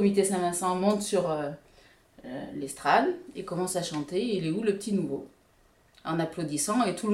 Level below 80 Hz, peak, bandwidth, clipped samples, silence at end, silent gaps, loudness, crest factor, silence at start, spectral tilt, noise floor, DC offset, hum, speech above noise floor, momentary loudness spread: -64 dBFS; -8 dBFS; 15.5 kHz; under 0.1%; 0 s; none; -29 LUFS; 20 dB; 0 s; -4.5 dB/octave; -63 dBFS; under 0.1%; none; 35 dB; 13 LU